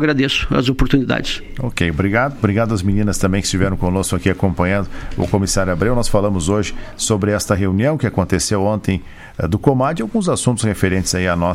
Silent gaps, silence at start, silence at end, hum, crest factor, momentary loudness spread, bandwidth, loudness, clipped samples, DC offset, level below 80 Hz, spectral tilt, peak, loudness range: none; 0 s; 0 s; none; 16 dB; 5 LU; 16 kHz; -17 LUFS; under 0.1%; under 0.1%; -30 dBFS; -5 dB/octave; 0 dBFS; 1 LU